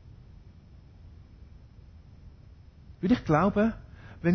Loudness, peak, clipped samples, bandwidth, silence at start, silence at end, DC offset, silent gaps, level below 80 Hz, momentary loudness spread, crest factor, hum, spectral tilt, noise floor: -26 LUFS; -12 dBFS; under 0.1%; 6.4 kHz; 1.05 s; 0 s; under 0.1%; none; -50 dBFS; 20 LU; 18 dB; none; -8.5 dB/octave; -52 dBFS